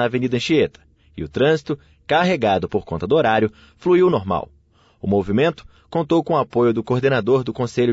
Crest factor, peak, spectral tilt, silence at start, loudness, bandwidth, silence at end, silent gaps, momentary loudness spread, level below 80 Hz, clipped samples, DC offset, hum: 14 dB; -4 dBFS; -7 dB/octave; 0 s; -19 LUFS; 8 kHz; 0 s; none; 10 LU; -48 dBFS; under 0.1%; under 0.1%; none